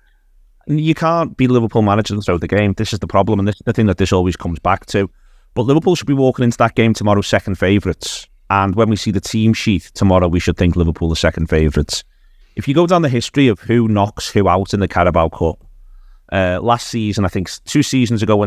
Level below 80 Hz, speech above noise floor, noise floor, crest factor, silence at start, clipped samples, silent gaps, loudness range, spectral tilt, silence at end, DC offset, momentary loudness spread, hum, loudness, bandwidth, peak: -30 dBFS; 35 dB; -50 dBFS; 16 dB; 0.65 s; under 0.1%; none; 2 LU; -6 dB/octave; 0 s; under 0.1%; 7 LU; none; -16 LUFS; 14.5 kHz; 0 dBFS